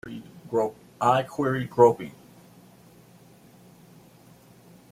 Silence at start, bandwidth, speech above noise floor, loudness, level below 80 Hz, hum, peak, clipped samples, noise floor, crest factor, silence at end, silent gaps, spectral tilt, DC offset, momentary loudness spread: 0.05 s; 15.5 kHz; 30 dB; -24 LUFS; -64 dBFS; none; -4 dBFS; under 0.1%; -53 dBFS; 24 dB; 2.8 s; none; -6.5 dB/octave; under 0.1%; 21 LU